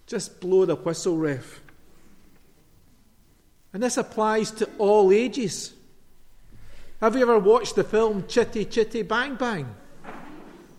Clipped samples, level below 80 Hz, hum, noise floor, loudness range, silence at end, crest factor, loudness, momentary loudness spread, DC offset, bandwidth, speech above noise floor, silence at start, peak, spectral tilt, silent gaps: under 0.1%; -50 dBFS; none; -57 dBFS; 8 LU; 0.15 s; 18 dB; -23 LUFS; 20 LU; under 0.1%; 13.5 kHz; 35 dB; 0.1 s; -8 dBFS; -5 dB/octave; none